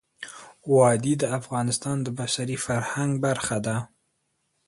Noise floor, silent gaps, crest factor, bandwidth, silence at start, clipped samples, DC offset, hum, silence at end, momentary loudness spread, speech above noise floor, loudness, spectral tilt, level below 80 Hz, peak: -74 dBFS; none; 18 dB; 11.5 kHz; 0.2 s; under 0.1%; under 0.1%; none; 0.8 s; 20 LU; 49 dB; -25 LUFS; -5 dB/octave; -60 dBFS; -8 dBFS